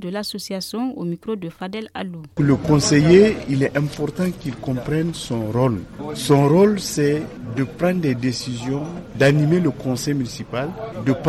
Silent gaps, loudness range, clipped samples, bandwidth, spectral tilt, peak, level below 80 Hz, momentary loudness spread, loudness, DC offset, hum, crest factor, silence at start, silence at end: none; 3 LU; under 0.1%; 14.5 kHz; -6 dB/octave; -2 dBFS; -46 dBFS; 14 LU; -20 LUFS; under 0.1%; none; 16 dB; 0 s; 0 s